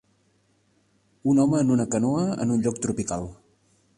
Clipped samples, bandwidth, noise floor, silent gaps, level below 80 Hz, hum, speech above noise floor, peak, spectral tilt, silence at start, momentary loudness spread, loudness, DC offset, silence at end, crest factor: under 0.1%; 11.5 kHz; -66 dBFS; none; -54 dBFS; none; 43 dB; -10 dBFS; -6.5 dB/octave; 1.25 s; 10 LU; -24 LUFS; under 0.1%; 0.65 s; 14 dB